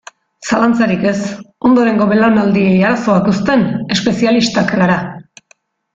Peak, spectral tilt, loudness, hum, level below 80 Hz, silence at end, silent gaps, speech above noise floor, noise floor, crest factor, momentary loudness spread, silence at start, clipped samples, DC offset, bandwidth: -2 dBFS; -6 dB/octave; -13 LUFS; none; -48 dBFS; 0.75 s; none; 41 dB; -53 dBFS; 12 dB; 7 LU; 0.4 s; under 0.1%; under 0.1%; 7.8 kHz